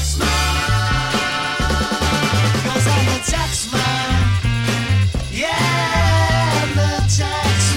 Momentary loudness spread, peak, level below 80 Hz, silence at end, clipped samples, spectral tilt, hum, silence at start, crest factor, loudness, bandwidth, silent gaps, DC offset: 3 LU; -4 dBFS; -26 dBFS; 0 s; under 0.1%; -4 dB/octave; none; 0 s; 12 dB; -17 LUFS; 16.5 kHz; none; under 0.1%